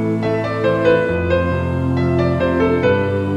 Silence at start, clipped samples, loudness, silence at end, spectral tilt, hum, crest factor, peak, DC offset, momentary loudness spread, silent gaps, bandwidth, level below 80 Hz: 0 s; under 0.1%; -17 LUFS; 0 s; -8.5 dB/octave; none; 14 dB; -2 dBFS; under 0.1%; 4 LU; none; 9.2 kHz; -36 dBFS